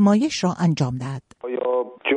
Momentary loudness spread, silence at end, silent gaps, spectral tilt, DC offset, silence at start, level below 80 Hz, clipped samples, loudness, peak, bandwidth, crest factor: 12 LU; 0 s; none; -6 dB/octave; under 0.1%; 0 s; -58 dBFS; under 0.1%; -23 LUFS; -6 dBFS; 10 kHz; 14 dB